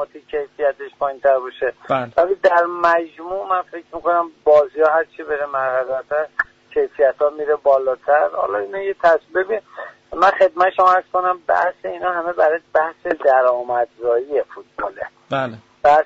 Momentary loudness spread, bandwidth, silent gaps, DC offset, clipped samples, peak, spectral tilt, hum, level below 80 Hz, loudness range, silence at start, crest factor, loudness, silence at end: 11 LU; 7.6 kHz; none; under 0.1%; under 0.1%; -4 dBFS; -2.5 dB/octave; none; -58 dBFS; 2 LU; 0 s; 14 dB; -18 LUFS; 0 s